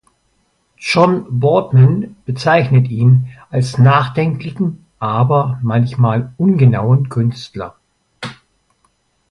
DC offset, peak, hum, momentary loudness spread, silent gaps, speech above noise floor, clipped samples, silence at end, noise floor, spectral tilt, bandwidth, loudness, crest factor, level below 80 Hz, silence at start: under 0.1%; 0 dBFS; none; 15 LU; none; 48 dB; under 0.1%; 1 s; -61 dBFS; -8 dB/octave; 11 kHz; -14 LUFS; 14 dB; -50 dBFS; 0.8 s